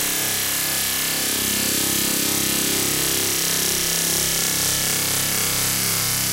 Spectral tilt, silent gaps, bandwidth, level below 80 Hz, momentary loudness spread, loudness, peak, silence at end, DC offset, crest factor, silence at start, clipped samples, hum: -1 dB/octave; none; 16 kHz; -46 dBFS; 1 LU; -18 LUFS; -2 dBFS; 0 s; under 0.1%; 20 dB; 0 s; under 0.1%; none